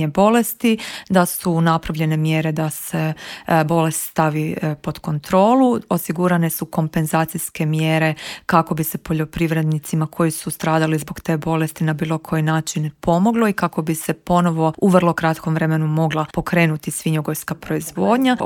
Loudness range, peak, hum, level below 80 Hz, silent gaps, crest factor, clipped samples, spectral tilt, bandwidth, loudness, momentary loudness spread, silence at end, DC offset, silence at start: 2 LU; 0 dBFS; none; -48 dBFS; none; 18 dB; under 0.1%; -6 dB/octave; 17.5 kHz; -19 LUFS; 8 LU; 0 s; under 0.1%; 0 s